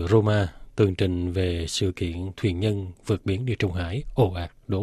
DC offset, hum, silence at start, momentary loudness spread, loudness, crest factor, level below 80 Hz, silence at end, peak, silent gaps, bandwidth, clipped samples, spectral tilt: under 0.1%; none; 0 s; 8 LU; -26 LUFS; 18 dB; -46 dBFS; 0 s; -6 dBFS; none; 12.5 kHz; under 0.1%; -6.5 dB/octave